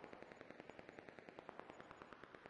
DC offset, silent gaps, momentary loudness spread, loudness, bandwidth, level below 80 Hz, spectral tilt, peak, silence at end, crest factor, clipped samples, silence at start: under 0.1%; none; 1 LU; -59 LUFS; 10 kHz; -84 dBFS; -5.5 dB/octave; -32 dBFS; 0 s; 26 dB; under 0.1%; 0 s